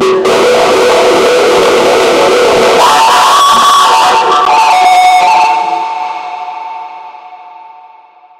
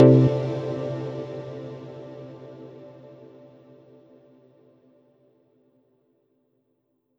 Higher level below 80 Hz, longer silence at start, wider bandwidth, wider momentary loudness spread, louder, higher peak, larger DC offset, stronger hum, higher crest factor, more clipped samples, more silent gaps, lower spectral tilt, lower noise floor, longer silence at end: first, -46 dBFS vs -64 dBFS; about the same, 0 s vs 0 s; first, 16.5 kHz vs 6 kHz; second, 15 LU vs 26 LU; first, -6 LUFS vs -25 LUFS; about the same, 0 dBFS vs -2 dBFS; neither; neither; second, 8 dB vs 24 dB; neither; neither; second, -2 dB/octave vs -10 dB/octave; second, -38 dBFS vs -72 dBFS; second, 0.7 s vs 4.3 s